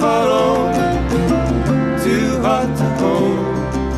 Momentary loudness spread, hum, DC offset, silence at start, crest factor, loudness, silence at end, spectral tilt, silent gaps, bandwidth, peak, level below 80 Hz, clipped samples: 3 LU; none; under 0.1%; 0 s; 10 dB; -16 LUFS; 0 s; -6.5 dB/octave; none; 14 kHz; -6 dBFS; -30 dBFS; under 0.1%